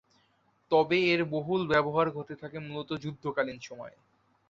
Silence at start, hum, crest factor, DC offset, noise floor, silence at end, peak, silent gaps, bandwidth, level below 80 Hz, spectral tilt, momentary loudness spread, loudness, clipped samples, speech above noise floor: 0.7 s; none; 20 dB; under 0.1%; -70 dBFS; 0.6 s; -12 dBFS; none; 7.6 kHz; -66 dBFS; -6.5 dB/octave; 16 LU; -29 LUFS; under 0.1%; 40 dB